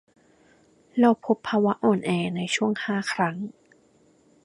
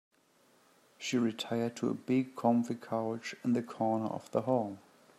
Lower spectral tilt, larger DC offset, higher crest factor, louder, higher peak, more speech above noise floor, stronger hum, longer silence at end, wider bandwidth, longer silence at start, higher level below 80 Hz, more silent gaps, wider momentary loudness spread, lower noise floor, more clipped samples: about the same, -5.5 dB/octave vs -6 dB/octave; neither; about the same, 20 dB vs 18 dB; first, -24 LUFS vs -34 LUFS; first, -6 dBFS vs -16 dBFS; about the same, 37 dB vs 35 dB; neither; first, 0.95 s vs 0.4 s; second, 11.5 kHz vs 13 kHz; about the same, 0.95 s vs 1 s; first, -68 dBFS vs -80 dBFS; neither; about the same, 7 LU vs 7 LU; second, -60 dBFS vs -68 dBFS; neither